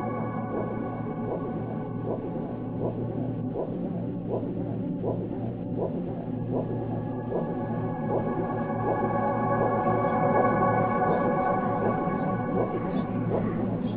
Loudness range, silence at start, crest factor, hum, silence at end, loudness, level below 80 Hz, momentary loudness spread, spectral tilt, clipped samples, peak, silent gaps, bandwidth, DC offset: 7 LU; 0 s; 16 dB; none; 0 s; -28 LUFS; -52 dBFS; 8 LU; -8.5 dB/octave; under 0.1%; -10 dBFS; none; 4.3 kHz; 0.1%